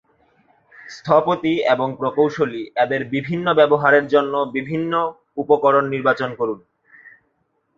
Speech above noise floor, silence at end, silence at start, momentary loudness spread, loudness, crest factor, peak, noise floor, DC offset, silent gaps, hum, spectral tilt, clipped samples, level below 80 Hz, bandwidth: 50 dB; 0.7 s; 0.85 s; 11 LU; -19 LUFS; 18 dB; -2 dBFS; -68 dBFS; under 0.1%; none; none; -7 dB/octave; under 0.1%; -62 dBFS; 7.2 kHz